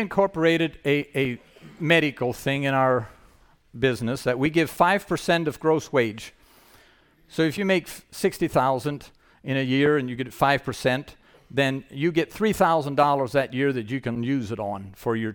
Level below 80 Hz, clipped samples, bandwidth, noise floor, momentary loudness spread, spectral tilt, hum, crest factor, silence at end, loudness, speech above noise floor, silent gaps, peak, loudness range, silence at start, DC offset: -54 dBFS; under 0.1%; 19 kHz; -57 dBFS; 10 LU; -6 dB/octave; none; 20 dB; 0 s; -24 LUFS; 34 dB; none; -4 dBFS; 2 LU; 0 s; under 0.1%